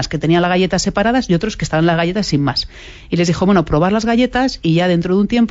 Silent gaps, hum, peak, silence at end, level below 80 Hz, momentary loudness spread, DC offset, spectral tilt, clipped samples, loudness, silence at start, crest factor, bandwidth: none; none; -2 dBFS; 0 s; -34 dBFS; 4 LU; under 0.1%; -5.5 dB/octave; under 0.1%; -15 LUFS; 0 s; 12 dB; 8 kHz